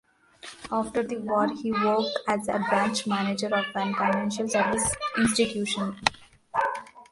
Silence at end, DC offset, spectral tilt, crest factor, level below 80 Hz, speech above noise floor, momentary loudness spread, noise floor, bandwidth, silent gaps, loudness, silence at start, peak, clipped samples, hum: 0.1 s; under 0.1%; -3.5 dB/octave; 26 dB; -56 dBFS; 22 dB; 6 LU; -48 dBFS; 11.5 kHz; none; -26 LUFS; 0.45 s; 0 dBFS; under 0.1%; none